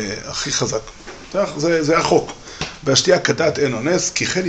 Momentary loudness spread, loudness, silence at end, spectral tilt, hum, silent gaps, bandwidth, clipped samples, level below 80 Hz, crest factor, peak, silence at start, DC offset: 13 LU; -18 LUFS; 0 s; -3.5 dB/octave; none; none; 9 kHz; under 0.1%; -46 dBFS; 18 dB; -2 dBFS; 0 s; under 0.1%